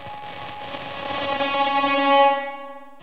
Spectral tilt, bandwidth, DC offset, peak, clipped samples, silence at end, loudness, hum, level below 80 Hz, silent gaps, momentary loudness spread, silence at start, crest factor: -5.5 dB/octave; 6.2 kHz; 0.7%; -6 dBFS; under 0.1%; 0.1 s; -20 LUFS; none; -60 dBFS; none; 18 LU; 0 s; 18 dB